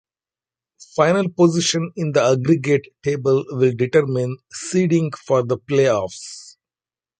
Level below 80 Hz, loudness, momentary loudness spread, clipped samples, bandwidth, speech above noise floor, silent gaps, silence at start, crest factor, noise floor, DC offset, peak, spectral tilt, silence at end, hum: -58 dBFS; -19 LUFS; 11 LU; under 0.1%; 9.4 kHz; over 72 dB; none; 0.8 s; 18 dB; under -90 dBFS; under 0.1%; -2 dBFS; -5.5 dB/octave; 0.7 s; none